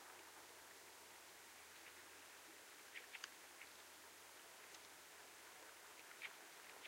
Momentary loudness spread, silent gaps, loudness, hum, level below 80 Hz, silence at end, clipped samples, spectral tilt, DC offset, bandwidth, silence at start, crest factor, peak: 5 LU; none; -58 LUFS; none; under -90 dBFS; 0 s; under 0.1%; 0 dB/octave; under 0.1%; 16 kHz; 0 s; 28 dB; -32 dBFS